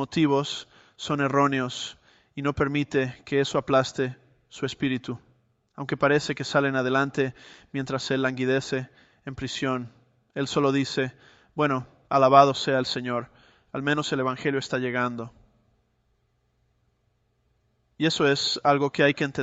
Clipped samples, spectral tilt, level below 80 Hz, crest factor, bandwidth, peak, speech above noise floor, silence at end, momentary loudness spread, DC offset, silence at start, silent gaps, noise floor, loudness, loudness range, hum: under 0.1%; -5 dB/octave; -60 dBFS; 24 dB; 8.2 kHz; -2 dBFS; 45 dB; 0 s; 13 LU; under 0.1%; 0 s; none; -70 dBFS; -25 LUFS; 6 LU; none